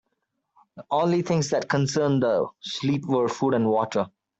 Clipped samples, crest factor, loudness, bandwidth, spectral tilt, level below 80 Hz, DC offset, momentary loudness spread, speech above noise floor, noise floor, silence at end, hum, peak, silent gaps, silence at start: under 0.1%; 16 dB; -24 LUFS; 8.2 kHz; -6 dB/octave; -64 dBFS; under 0.1%; 5 LU; 54 dB; -77 dBFS; 0.3 s; none; -10 dBFS; none; 0.75 s